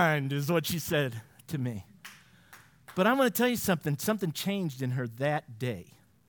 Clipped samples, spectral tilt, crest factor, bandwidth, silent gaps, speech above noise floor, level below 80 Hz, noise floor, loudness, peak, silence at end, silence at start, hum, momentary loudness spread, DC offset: under 0.1%; -5 dB/octave; 20 dB; 18 kHz; none; 27 dB; -68 dBFS; -56 dBFS; -30 LUFS; -10 dBFS; 0.45 s; 0 s; none; 16 LU; under 0.1%